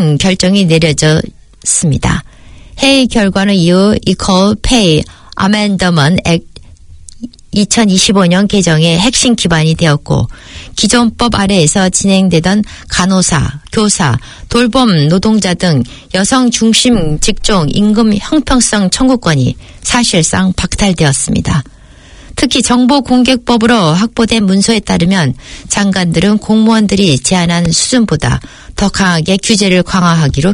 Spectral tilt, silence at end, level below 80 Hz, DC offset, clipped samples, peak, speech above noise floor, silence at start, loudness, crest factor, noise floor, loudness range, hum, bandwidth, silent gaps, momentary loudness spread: -4.5 dB/octave; 0 s; -28 dBFS; under 0.1%; 0.3%; 0 dBFS; 26 dB; 0 s; -10 LUFS; 10 dB; -35 dBFS; 2 LU; none; 11 kHz; none; 7 LU